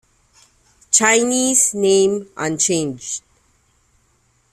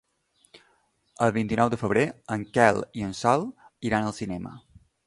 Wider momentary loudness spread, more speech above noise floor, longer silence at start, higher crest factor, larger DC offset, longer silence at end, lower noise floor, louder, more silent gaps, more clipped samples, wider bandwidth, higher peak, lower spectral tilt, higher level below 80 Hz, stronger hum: about the same, 13 LU vs 13 LU; about the same, 44 dB vs 42 dB; second, 0.9 s vs 1.2 s; about the same, 20 dB vs 24 dB; neither; first, 1.35 s vs 0.45 s; second, -61 dBFS vs -67 dBFS; first, -16 LUFS vs -26 LUFS; neither; neither; first, 14.5 kHz vs 11.5 kHz; first, 0 dBFS vs -4 dBFS; second, -2.5 dB/octave vs -6 dB/octave; about the same, -60 dBFS vs -56 dBFS; neither